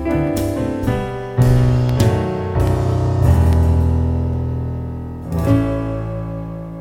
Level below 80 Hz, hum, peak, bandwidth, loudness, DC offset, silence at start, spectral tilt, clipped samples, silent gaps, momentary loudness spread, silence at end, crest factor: -24 dBFS; none; -2 dBFS; 17 kHz; -18 LUFS; under 0.1%; 0 s; -8 dB/octave; under 0.1%; none; 11 LU; 0 s; 14 dB